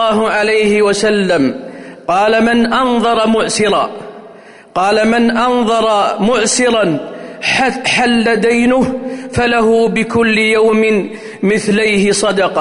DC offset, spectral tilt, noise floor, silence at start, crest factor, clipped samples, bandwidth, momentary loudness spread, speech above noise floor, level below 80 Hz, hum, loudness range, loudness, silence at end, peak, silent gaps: under 0.1%; -4 dB/octave; -37 dBFS; 0 s; 10 dB; under 0.1%; 11 kHz; 8 LU; 25 dB; -44 dBFS; none; 1 LU; -12 LUFS; 0 s; -4 dBFS; none